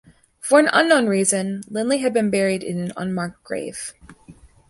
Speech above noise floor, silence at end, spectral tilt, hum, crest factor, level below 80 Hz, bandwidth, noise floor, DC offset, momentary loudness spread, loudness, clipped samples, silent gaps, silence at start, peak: 28 dB; 0.35 s; -4 dB/octave; none; 20 dB; -58 dBFS; 12 kHz; -47 dBFS; under 0.1%; 15 LU; -20 LUFS; under 0.1%; none; 0.45 s; -2 dBFS